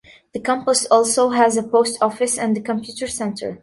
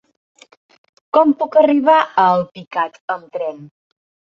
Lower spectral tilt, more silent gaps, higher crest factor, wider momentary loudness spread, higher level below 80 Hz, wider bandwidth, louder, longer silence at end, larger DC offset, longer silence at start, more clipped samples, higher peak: second, -3 dB/octave vs -7 dB/octave; second, none vs 3.00-3.08 s; about the same, 18 dB vs 16 dB; about the same, 11 LU vs 13 LU; first, -58 dBFS vs -66 dBFS; first, 12 kHz vs 7.4 kHz; second, -19 LUFS vs -16 LUFS; second, 0.05 s vs 0.65 s; neither; second, 0.35 s vs 1.15 s; neither; about the same, -2 dBFS vs -2 dBFS